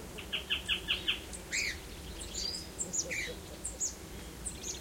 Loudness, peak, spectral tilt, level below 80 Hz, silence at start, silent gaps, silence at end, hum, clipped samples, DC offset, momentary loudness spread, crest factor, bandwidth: -36 LUFS; -18 dBFS; -1 dB/octave; -50 dBFS; 0 s; none; 0 s; none; under 0.1%; under 0.1%; 11 LU; 22 dB; 16.5 kHz